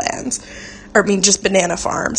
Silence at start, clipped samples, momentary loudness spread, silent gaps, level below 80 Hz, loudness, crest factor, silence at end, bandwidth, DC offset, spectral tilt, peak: 0 s; under 0.1%; 15 LU; none; -44 dBFS; -16 LUFS; 18 dB; 0 s; 9.8 kHz; under 0.1%; -2.5 dB/octave; 0 dBFS